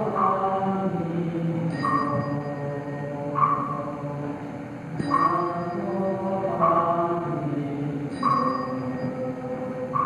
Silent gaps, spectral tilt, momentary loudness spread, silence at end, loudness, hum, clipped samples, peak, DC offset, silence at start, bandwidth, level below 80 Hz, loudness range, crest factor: none; -8.5 dB/octave; 9 LU; 0 s; -26 LUFS; none; under 0.1%; -8 dBFS; under 0.1%; 0 s; 10.5 kHz; -60 dBFS; 2 LU; 18 dB